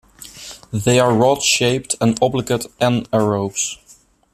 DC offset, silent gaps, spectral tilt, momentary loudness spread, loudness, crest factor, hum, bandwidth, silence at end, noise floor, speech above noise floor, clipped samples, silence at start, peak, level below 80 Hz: under 0.1%; none; -4 dB/octave; 19 LU; -17 LUFS; 18 dB; none; 14.5 kHz; 0.6 s; -51 dBFS; 34 dB; under 0.1%; 0.2 s; 0 dBFS; -50 dBFS